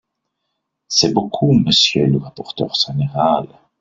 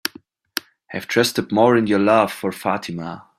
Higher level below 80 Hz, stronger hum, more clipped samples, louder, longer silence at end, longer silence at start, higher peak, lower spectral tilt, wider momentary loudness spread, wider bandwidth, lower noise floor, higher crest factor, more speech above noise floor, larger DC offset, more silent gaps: first, -50 dBFS vs -60 dBFS; neither; neither; first, -16 LUFS vs -19 LUFS; first, 0.35 s vs 0.2 s; first, 0.9 s vs 0.05 s; about the same, -2 dBFS vs -2 dBFS; about the same, -4.5 dB/octave vs -4.5 dB/octave; second, 10 LU vs 14 LU; second, 7.8 kHz vs 16 kHz; first, -75 dBFS vs -47 dBFS; about the same, 16 dB vs 18 dB; first, 59 dB vs 28 dB; neither; neither